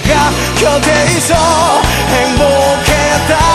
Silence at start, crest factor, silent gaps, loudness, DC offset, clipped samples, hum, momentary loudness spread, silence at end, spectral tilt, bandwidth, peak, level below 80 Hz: 0 s; 10 dB; none; -10 LUFS; under 0.1%; under 0.1%; none; 2 LU; 0 s; -3.5 dB/octave; 13.5 kHz; 0 dBFS; -22 dBFS